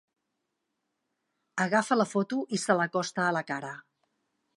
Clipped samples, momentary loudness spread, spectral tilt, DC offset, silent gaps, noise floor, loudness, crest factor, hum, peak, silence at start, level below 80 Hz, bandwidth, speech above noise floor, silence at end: under 0.1%; 12 LU; -4.5 dB/octave; under 0.1%; none; -82 dBFS; -29 LUFS; 22 dB; none; -10 dBFS; 1.55 s; -82 dBFS; 11.5 kHz; 54 dB; 0.75 s